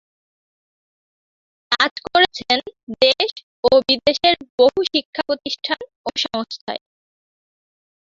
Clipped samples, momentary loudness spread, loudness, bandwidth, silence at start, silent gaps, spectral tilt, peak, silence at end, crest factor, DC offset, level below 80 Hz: under 0.1%; 11 LU; -18 LUFS; 7.6 kHz; 1.7 s; 1.91-1.96 s, 2.83-2.87 s, 3.43-3.63 s, 4.50-4.58 s, 5.05-5.13 s, 5.96-6.04 s, 6.61-6.67 s; -3 dB/octave; 0 dBFS; 1.25 s; 20 dB; under 0.1%; -56 dBFS